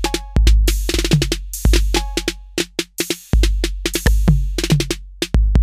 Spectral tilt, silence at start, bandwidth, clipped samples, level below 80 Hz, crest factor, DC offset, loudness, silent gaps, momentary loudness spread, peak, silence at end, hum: -4.5 dB/octave; 0 s; 16 kHz; under 0.1%; -18 dBFS; 16 dB; under 0.1%; -19 LUFS; none; 7 LU; 0 dBFS; 0 s; none